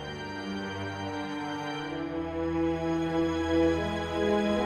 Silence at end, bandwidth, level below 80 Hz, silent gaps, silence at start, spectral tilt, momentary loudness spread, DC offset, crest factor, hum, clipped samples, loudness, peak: 0 s; 10.5 kHz; -48 dBFS; none; 0 s; -6 dB/octave; 9 LU; under 0.1%; 14 dB; none; under 0.1%; -30 LUFS; -16 dBFS